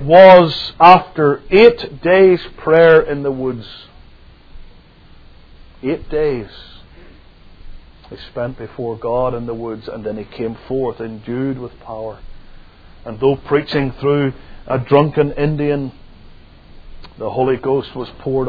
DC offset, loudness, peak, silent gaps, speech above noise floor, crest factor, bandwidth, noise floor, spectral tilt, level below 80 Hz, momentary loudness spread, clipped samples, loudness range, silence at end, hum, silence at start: under 0.1%; -14 LUFS; 0 dBFS; none; 29 dB; 16 dB; 5.4 kHz; -43 dBFS; -8.5 dB/octave; -38 dBFS; 19 LU; 0.4%; 14 LU; 0 s; none; 0 s